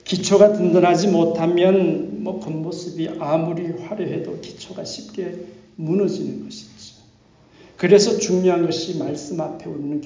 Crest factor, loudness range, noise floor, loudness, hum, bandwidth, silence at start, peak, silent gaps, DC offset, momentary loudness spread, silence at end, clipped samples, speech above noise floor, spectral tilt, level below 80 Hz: 18 dB; 10 LU; -53 dBFS; -20 LUFS; none; 7.6 kHz; 0.05 s; -2 dBFS; none; under 0.1%; 18 LU; 0 s; under 0.1%; 33 dB; -5.5 dB/octave; -60 dBFS